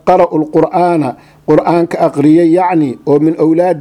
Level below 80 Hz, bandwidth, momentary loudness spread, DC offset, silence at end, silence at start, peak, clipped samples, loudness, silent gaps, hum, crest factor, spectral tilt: -48 dBFS; 11 kHz; 5 LU; under 0.1%; 0 s; 0.05 s; 0 dBFS; 0.2%; -11 LUFS; none; none; 10 dB; -8.5 dB/octave